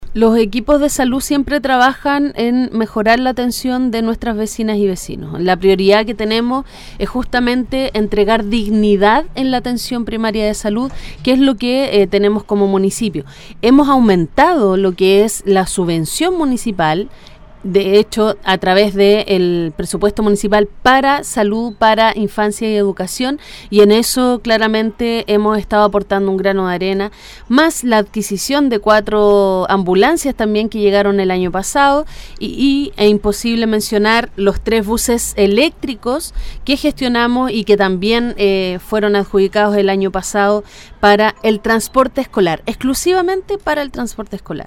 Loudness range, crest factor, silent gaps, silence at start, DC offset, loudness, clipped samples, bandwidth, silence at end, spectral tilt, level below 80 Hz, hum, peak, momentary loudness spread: 2 LU; 14 dB; none; 0 s; under 0.1%; -14 LUFS; under 0.1%; 17 kHz; 0.05 s; -4.5 dB/octave; -34 dBFS; none; 0 dBFS; 8 LU